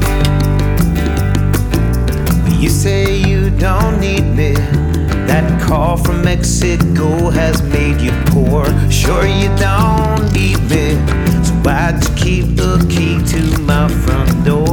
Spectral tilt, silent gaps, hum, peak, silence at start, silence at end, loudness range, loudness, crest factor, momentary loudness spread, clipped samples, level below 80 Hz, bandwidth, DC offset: -6 dB/octave; none; none; 0 dBFS; 0 s; 0 s; 1 LU; -13 LUFS; 12 dB; 2 LU; under 0.1%; -18 dBFS; 19.5 kHz; under 0.1%